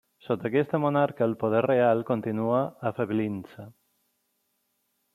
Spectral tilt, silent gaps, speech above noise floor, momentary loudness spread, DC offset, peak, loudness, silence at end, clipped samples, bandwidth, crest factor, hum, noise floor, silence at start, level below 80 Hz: -9 dB/octave; none; 49 dB; 10 LU; under 0.1%; -10 dBFS; -26 LUFS; 1.45 s; under 0.1%; 14 kHz; 18 dB; none; -75 dBFS; 0.3 s; -72 dBFS